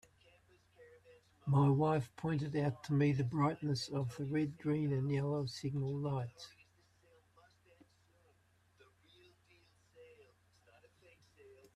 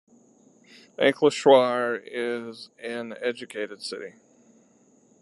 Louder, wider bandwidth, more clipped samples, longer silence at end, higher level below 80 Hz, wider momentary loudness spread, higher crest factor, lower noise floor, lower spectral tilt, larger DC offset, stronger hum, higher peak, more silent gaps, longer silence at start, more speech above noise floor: second, -36 LUFS vs -24 LUFS; about the same, 11 kHz vs 11.5 kHz; neither; second, 0.25 s vs 1.1 s; first, -70 dBFS vs -82 dBFS; second, 8 LU vs 20 LU; about the same, 18 dB vs 22 dB; first, -72 dBFS vs -60 dBFS; first, -7.5 dB/octave vs -4 dB/octave; neither; neither; second, -20 dBFS vs -4 dBFS; neither; second, 0.8 s vs 1 s; about the same, 37 dB vs 35 dB